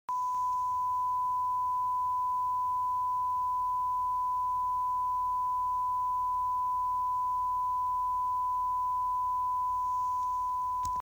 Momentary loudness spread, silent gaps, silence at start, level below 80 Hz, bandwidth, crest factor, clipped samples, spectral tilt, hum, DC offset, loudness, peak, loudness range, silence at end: 1 LU; none; 0.1 s; -58 dBFS; over 20 kHz; 8 dB; under 0.1%; -3.5 dB/octave; none; under 0.1%; -31 LUFS; -22 dBFS; 0 LU; 0 s